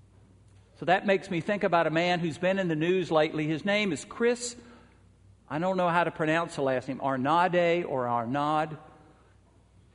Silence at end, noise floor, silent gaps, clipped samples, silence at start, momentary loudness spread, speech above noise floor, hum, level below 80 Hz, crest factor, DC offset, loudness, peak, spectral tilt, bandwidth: 1.1 s; -60 dBFS; none; under 0.1%; 0.8 s; 7 LU; 33 dB; none; -64 dBFS; 20 dB; under 0.1%; -27 LUFS; -10 dBFS; -5.5 dB/octave; 11 kHz